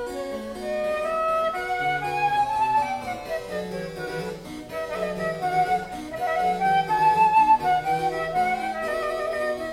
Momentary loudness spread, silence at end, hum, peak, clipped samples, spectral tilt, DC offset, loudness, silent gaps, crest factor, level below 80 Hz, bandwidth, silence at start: 13 LU; 0 s; none; -10 dBFS; under 0.1%; -4.5 dB/octave; under 0.1%; -24 LUFS; none; 16 dB; -52 dBFS; 16 kHz; 0 s